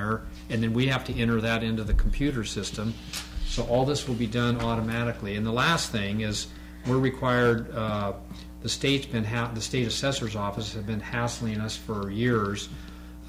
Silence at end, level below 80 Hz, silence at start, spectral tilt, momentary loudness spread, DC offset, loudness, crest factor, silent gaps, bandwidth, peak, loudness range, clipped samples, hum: 0 s; -36 dBFS; 0 s; -5 dB/octave; 9 LU; under 0.1%; -28 LUFS; 14 dB; none; 16 kHz; -12 dBFS; 2 LU; under 0.1%; none